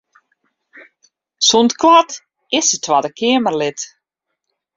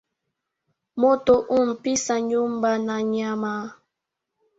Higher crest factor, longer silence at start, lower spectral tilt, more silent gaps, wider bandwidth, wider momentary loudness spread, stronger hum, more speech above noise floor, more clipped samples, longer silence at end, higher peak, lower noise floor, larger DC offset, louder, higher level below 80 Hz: about the same, 16 dB vs 18 dB; first, 1.4 s vs 0.95 s; second, -2 dB/octave vs -4 dB/octave; neither; about the same, 7.8 kHz vs 8 kHz; first, 15 LU vs 10 LU; neither; about the same, 63 dB vs 61 dB; neither; about the same, 0.9 s vs 0.85 s; first, 0 dBFS vs -6 dBFS; second, -77 dBFS vs -83 dBFS; neither; first, -14 LUFS vs -22 LUFS; about the same, -62 dBFS vs -60 dBFS